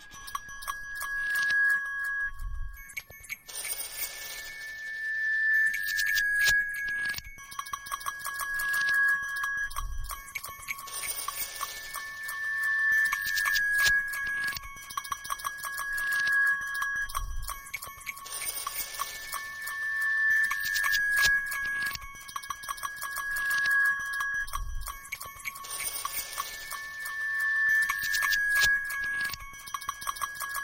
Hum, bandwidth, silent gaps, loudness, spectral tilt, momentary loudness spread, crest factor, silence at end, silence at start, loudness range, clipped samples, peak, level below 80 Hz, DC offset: none; 17 kHz; none; -29 LUFS; 1 dB/octave; 15 LU; 20 dB; 0 s; 0 s; 6 LU; under 0.1%; -12 dBFS; -46 dBFS; under 0.1%